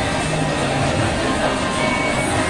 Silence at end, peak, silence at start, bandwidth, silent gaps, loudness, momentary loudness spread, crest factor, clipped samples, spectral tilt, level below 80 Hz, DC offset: 0 s; -6 dBFS; 0 s; 11.5 kHz; none; -19 LUFS; 2 LU; 14 dB; under 0.1%; -4.5 dB/octave; -36 dBFS; under 0.1%